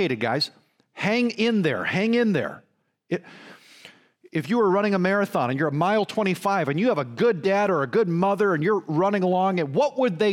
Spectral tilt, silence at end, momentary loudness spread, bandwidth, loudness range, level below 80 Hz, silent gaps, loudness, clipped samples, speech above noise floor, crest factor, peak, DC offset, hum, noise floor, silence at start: -6.5 dB/octave; 0 s; 6 LU; 16 kHz; 4 LU; -72 dBFS; none; -23 LUFS; under 0.1%; 28 dB; 14 dB; -8 dBFS; under 0.1%; none; -51 dBFS; 0 s